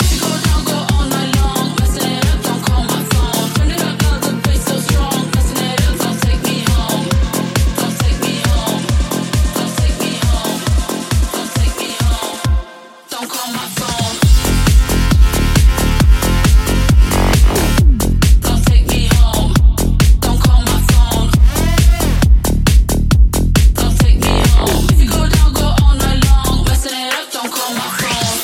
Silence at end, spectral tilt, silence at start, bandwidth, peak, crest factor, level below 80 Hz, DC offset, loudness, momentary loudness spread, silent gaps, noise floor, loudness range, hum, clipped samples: 0 s; -4.5 dB/octave; 0 s; 17 kHz; 0 dBFS; 12 dB; -14 dBFS; under 0.1%; -14 LUFS; 5 LU; none; -35 dBFS; 4 LU; none; under 0.1%